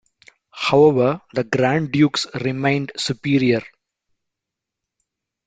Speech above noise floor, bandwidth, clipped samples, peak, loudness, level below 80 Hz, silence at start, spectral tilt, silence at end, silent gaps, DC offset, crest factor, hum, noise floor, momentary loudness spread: 66 dB; 9.4 kHz; under 0.1%; -2 dBFS; -19 LUFS; -58 dBFS; 0.55 s; -6 dB/octave; 1.8 s; none; under 0.1%; 18 dB; none; -84 dBFS; 10 LU